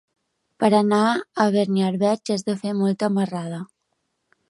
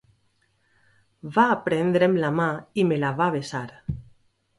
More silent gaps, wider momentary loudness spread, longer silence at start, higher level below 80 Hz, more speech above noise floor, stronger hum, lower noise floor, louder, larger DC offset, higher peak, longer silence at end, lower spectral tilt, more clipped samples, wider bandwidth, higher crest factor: neither; second, 11 LU vs 15 LU; second, 0.6 s vs 1.25 s; second, -70 dBFS vs -52 dBFS; first, 54 dB vs 45 dB; neither; first, -74 dBFS vs -67 dBFS; about the same, -21 LUFS vs -23 LUFS; neither; about the same, -4 dBFS vs -6 dBFS; first, 0.85 s vs 0.6 s; about the same, -6.5 dB/octave vs -7 dB/octave; neither; about the same, 11.5 kHz vs 11.5 kHz; about the same, 18 dB vs 20 dB